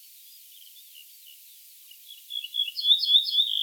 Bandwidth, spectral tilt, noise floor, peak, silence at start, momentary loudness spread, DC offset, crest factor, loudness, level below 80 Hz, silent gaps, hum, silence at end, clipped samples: over 20 kHz; 10.5 dB/octave; -50 dBFS; -8 dBFS; 0.75 s; 23 LU; under 0.1%; 20 dB; -22 LUFS; under -90 dBFS; none; none; 0 s; under 0.1%